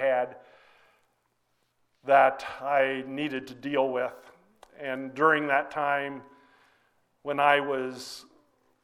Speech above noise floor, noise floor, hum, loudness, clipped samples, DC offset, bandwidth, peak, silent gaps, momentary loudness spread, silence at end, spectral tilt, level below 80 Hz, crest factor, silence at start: 47 dB; -73 dBFS; none; -27 LUFS; under 0.1%; under 0.1%; 13.5 kHz; -6 dBFS; none; 18 LU; 0.6 s; -5 dB/octave; -74 dBFS; 22 dB; 0 s